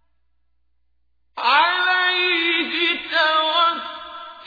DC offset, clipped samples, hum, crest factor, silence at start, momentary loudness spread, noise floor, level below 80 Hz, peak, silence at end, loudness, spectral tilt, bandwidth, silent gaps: under 0.1%; under 0.1%; none; 16 dB; 1.35 s; 16 LU; -72 dBFS; -66 dBFS; -4 dBFS; 0 s; -18 LUFS; -2 dB/octave; 5 kHz; none